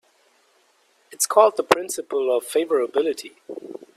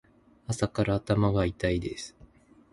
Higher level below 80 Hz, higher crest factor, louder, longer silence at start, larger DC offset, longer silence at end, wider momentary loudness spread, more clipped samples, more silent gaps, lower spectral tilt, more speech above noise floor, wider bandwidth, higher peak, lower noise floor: second, -76 dBFS vs -44 dBFS; about the same, 22 dB vs 20 dB; first, -21 LUFS vs -28 LUFS; first, 1.1 s vs 0.5 s; neither; second, 0.2 s vs 0.65 s; first, 20 LU vs 15 LU; neither; neither; second, -2 dB/octave vs -6.5 dB/octave; first, 41 dB vs 29 dB; first, 15.5 kHz vs 11.5 kHz; first, 0 dBFS vs -10 dBFS; first, -62 dBFS vs -57 dBFS